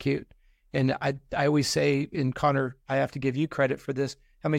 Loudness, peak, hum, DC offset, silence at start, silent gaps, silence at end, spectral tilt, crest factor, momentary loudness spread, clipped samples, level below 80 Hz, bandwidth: -27 LUFS; -12 dBFS; none; under 0.1%; 0 s; none; 0 s; -6 dB/octave; 16 dB; 7 LU; under 0.1%; -56 dBFS; 16 kHz